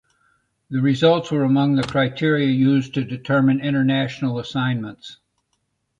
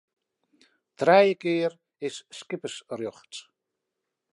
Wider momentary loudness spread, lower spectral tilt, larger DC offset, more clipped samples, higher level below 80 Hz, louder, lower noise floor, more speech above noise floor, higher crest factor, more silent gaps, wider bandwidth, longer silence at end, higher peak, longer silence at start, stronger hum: second, 10 LU vs 22 LU; first, -7.5 dB/octave vs -5 dB/octave; neither; neither; first, -58 dBFS vs -82 dBFS; first, -20 LUFS vs -25 LUFS; second, -72 dBFS vs -84 dBFS; second, 52 dB vs 59 dB; second, 16 dB vs 22 dB; neither; second, 7.8 kHz vs 11.5 kHz; about the same, 0.85 s vs 0.95 s; about the same, -4 dBFS vs -6 dBFS; second, 0.7 s vs 1 s; neither